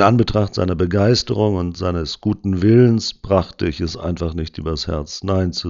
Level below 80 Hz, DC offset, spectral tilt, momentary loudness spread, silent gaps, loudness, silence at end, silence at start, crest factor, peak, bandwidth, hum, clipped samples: -36 dBFS; under 0.1%; -6.5 dB/octave; 10 LU; none; -19 LUFS; 0 s; 0 s; 18 dB; 0 dBFS; 7.6 kHz; none; under 0.1%